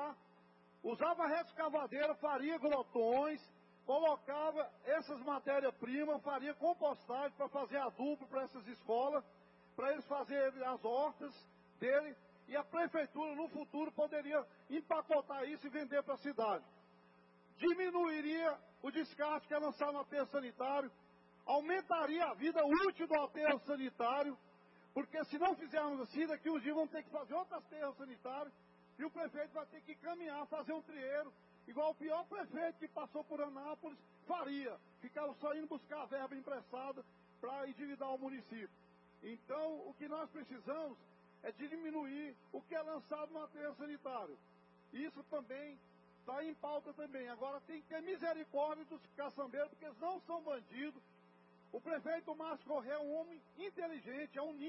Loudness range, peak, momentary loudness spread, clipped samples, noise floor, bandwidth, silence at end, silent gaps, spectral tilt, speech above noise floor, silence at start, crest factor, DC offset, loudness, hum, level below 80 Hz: 9 LU; -22 dBFS; 13 LU; under 0.1%; -68 dBFS; 5.6 kHz; 0 s; none; -2.5 dB/octave; 27 dB; 0 s; 20 dB; under 0.1%; -42 LUFS; none; -86 dBFS